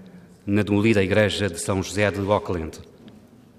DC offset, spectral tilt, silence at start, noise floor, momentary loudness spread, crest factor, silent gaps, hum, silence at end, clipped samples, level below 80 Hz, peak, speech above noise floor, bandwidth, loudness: under 0.1%; -5.5 dB/octave; 0 s; -49 dBFS; 14 LU; 18 dB; none; none; 0.5 s; under 0.1%; -52 dBFS; -4 dBFS; 27 dB; 14.5 kHz; -22 LUFS